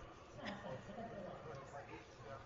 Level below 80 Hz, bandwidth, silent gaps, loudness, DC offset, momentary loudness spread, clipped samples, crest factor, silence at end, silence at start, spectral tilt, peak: -68 dBFS; 7.4 kHz; none; -52 LUFS; under 0.1%; 6 LU; under 0.1%; 18 dB; 0 s; 0 s; -4.5 dB/octave; -32 dBFS